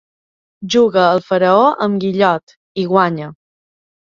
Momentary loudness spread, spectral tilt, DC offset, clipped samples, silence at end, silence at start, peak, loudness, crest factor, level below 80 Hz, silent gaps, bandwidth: 15 LU; -6 dB/octave; under 0.1%; under 0.1%; 0.8 s; 0.6 s; 0 dBFS; -14 LUFS; 16 dB; -60 dBFS; 2.43-2.47 s, 2.56-2.75 s; 7.4 kHz